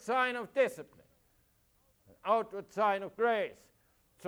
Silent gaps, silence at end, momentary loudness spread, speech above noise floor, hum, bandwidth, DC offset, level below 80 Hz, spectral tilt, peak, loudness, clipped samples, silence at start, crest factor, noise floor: none; 0 s; 11 LU; 39 dB; none; over 20 kHz; under 0.1%; -76 dBFS; -4 dB/octave; -16 dBFS; -33 LUFS; under 0.1%; 0.05 s; 18 dB; -71 dBFS